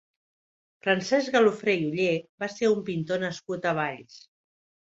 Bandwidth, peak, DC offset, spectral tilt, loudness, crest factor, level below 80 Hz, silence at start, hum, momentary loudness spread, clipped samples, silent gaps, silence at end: 8 kHz; -8 dBFS; under 0.1%; -5 dB/octave; -26 LUFS; 18 dB; -70 dBFS; 0.85 s; none; 10 LU; under 0.1%; 2.29-2.38 s; 0.7 s